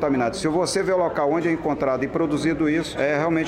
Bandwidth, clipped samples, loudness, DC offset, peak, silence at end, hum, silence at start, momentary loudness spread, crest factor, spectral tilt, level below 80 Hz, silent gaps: 13.5 kHz; under 0.1%; -22 LUFS; under 0.1%; -10 dBFS; 0 s; none; 0 s; 2 LU; 12 dB; -5.5 dB/octave; -48 dBFS; none